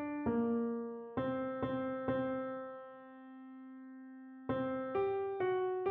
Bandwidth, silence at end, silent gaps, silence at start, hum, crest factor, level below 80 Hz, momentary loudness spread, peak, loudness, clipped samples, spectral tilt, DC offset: 4.3 kHz; 0 s; none; 0 s; none; 14 dB; -68 dBFS; 17 LU; -24 dBFS; -38 LUFS; under 0.1%; -6.5 dB/octave; under 0.1%